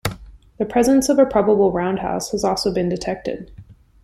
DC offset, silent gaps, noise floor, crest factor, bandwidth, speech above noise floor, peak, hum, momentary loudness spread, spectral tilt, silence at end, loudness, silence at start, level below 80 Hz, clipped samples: under 0.1%; none; -39 dBFS; 16 dB; 15.5 kHz; 21 dB; -4 dBFS; none; 12 LU; -5 dB/octave; 0.3 s; -19 LUFS; 0.05 s; -44 dBFS; under 0.1%